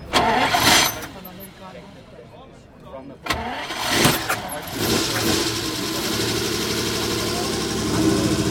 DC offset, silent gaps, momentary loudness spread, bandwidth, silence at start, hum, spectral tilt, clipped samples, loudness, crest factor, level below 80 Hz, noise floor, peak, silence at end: under 0.1%; none; 22 LU; 19.5 kHz; 0 s; none; -3 dB/octave; under 0.1%; -20 LUFS; 18 dB; -42 dBFS; -44 dBFS; -4 dBFS; 0 s